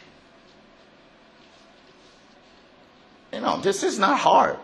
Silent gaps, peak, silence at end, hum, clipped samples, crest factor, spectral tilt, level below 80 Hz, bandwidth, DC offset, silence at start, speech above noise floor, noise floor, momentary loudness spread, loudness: none; -4 dBFS; 0 s; none; under 0.1%; 22 dB; -3.5 dB/octave; -66 dBFS; 12 kHz; under 0.1%; 3.35 s; 33 dB; -53 dBFS; 11 LU; -21 LUFS